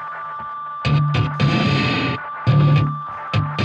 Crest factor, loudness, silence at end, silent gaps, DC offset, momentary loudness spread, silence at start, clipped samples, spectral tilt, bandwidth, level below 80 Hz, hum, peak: 14 dB; -19 LUFS; 0 s; none; under 0.1%; 13 LU; 0 s; under 0.1%; -7 dB/octave; 7.4 kHz; -42 dBFS; none; -6 dBFS